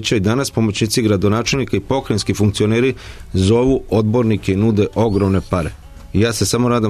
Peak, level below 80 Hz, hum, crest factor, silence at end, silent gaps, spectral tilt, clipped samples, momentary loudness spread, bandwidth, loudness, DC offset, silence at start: -4 dBFS; -36 dBFS; none; 12 dB; 0 s; none; -5.5 dB/octave; under 0.1%; 5 LU; 13.5 kHz; -17 LUFS; under 0.1%; 0 s